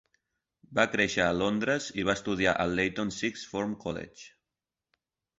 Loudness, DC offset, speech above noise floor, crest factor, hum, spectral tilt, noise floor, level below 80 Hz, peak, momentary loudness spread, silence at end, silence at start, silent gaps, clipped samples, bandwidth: -29 LUFS; under 0.1%; 60 dB; 24 dB; none; -4.5 dB/octave; -89 dBFS; -56 dBFS; -8 dBFS; 9 LU; 1.1 s; 0.7 s; none; under 0.1%; 8 kHz